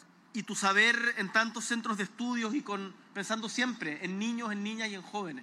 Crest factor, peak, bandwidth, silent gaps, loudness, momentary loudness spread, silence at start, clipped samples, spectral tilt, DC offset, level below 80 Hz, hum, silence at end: 20 dB; -12 dBFS; 13.5 kHz; none; -31 LUFS; 14 LU; 0.35 s; under 0.1%; -3 dB/octave; under 0.1%; under -90 dBFS; none; 0 s